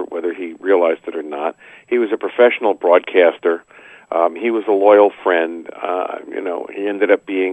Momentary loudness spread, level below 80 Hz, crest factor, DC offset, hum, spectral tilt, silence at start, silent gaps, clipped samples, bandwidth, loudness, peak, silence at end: 13 LU; -72 dBFS; 16 dB; under 0.1%; none; -5.5 dB/octave; 0 s; none; under 0.1%; 8.2 kHz; -17 LUFS; 0 dBFS; 0 s